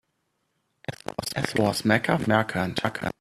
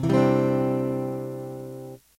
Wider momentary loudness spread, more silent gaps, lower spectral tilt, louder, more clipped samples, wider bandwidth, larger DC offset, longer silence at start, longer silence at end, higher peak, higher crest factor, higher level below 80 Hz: second, 14 LU vs 17 LU; neither; second, -5 dB/octave vs -8.5 dB/octave; about the same, -25 LUFS vs -25 LUFS; neither; second, 14.5 kHz vs 16 kHz; neither; first, 0.9 s vs 0 s; about the same, 0.1 s vs 0.2 s; first, -4 dBFS vs -10 dBFS; first, 22 dB vs 14 dB; about the same, -56 dBFS vs -56 dBFS